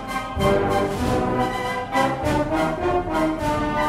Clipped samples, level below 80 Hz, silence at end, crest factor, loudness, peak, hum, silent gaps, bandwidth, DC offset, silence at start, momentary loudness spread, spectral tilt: under 0.1%; -36 dBFS; 0 s; 14 dB; -22 LUFS; -8 dBFS; none; none; 16 kHz; under 0.1%; 0 s; 3 LU; -6 dB/octave